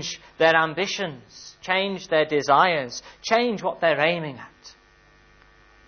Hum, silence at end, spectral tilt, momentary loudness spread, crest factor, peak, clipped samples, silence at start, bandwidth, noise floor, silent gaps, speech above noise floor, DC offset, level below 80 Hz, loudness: none; 1.2 s; -3.5 dB/octave; 18 LU; 20 dB; -4 dBFS; under 0.1%; 0 s; 6.6 kHz; -55 dBFS; none; 32 dB; under 0.1%; -62 dBFS; -22 LUFS